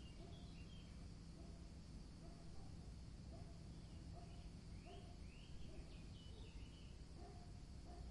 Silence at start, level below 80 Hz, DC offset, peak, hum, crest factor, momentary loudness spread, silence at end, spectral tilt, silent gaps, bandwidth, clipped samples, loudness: 0 s; -60 dBFS; under 0.1%; -42 dBFS; none; 14 dB; 2 LU; 0 s; -6 dB/octave; none; 11 kHz; under 0.1%; -59 LUFS